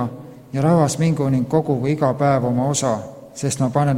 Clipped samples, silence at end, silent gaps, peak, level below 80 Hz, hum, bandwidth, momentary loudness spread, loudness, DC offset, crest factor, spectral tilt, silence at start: under 0.1%; 0 s; none; -2 dBFS; -52 dBFS; none; 15 kHz; 11 LU; -19 LUFS; under 0.1%; 16 dB; -6.5 dB/octave; 0 s